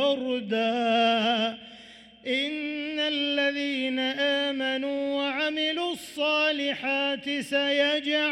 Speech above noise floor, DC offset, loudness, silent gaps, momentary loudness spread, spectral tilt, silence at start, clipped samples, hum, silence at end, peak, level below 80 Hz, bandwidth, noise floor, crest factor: 23 dB; under 0.1%; -26 LUFS; none; 7 LU; -3.5 dB/octave; 0 s; under 0.1%; none; 0 s; -12 dBFS; -72 dBFS; 14 kHz; -50 dBFS; 14 dB